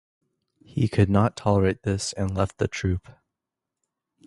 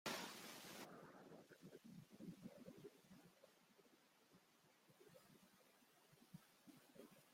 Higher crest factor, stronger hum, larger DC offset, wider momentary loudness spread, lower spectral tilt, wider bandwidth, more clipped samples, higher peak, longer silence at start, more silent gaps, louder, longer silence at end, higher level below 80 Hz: second, 20 dB vs 28 dB; neither; neither; second, 7 LU vs 14 LU; first, -6.5 dB/octave vs -3.5 dB/octave; second, 11.5 kHz vs 16 kHz; neither; first, -4 dBFS vs -34 dBFS; first, 0.75 s vs 0.05 s; neither; first, -25 LUFS vs -60 LUFS; first, 1.15 s vs 0 s; first, -42 dBFS vs under -90 dBFS